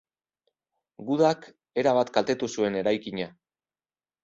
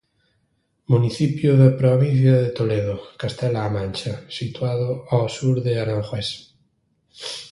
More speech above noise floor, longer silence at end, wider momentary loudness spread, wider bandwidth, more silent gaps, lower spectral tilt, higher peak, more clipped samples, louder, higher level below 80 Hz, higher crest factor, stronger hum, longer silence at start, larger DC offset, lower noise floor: first, over 65 dB vs 49 dB; first, 0.95 s vs 0.05 s; about the same, 12 LU vs 14 LU; second, 7.8 kHz vs 11.5 kHz; neither; second, -5 dB/octave vs -7.5 dB/octave; second, -8 dBFS vs -2 dBFS; neither; second, -26 LUFS vs -21 LUFS; second, -68 dBFS vs -50 dBFS; about the same, 20 dB vs 18 dB; neither; about the same, 1 s vs 0.9 s; neither; first, under -90 dBFS vs -68 dBFS